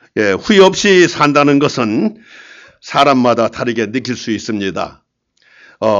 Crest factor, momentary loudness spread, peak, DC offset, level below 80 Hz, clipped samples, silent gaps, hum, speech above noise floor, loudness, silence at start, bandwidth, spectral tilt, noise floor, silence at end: 14 dB; 11 LU; 0 dBFS; under 0.1%; -52 dBFS; under 0.1%; none; none; 42 dB; -13 LUFS; 0.15 s; 7.8 kHz; -4.5 dB/octave; -55 dBFS; 0 s